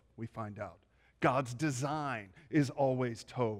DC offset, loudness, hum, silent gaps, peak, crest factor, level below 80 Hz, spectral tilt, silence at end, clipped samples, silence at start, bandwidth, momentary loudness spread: under 0.1%; -35 LUFS; none; none; -18 dBFS; 18 dB; -68 dBFS; -6 dB/octave; 0 s; under 0.1%; 0.15 s; 14.5 kHz; 12 LU